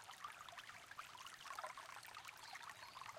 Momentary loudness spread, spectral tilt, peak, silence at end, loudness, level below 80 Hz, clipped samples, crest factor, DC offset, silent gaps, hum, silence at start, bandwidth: 4 LU; -0.5 dB/octave; -36 dBFS; 0 s; -54 LUFS; -86 dBFS; under 0.1%; 20 dB; under 0.1%; none; none; 0 s; 16.5 kHz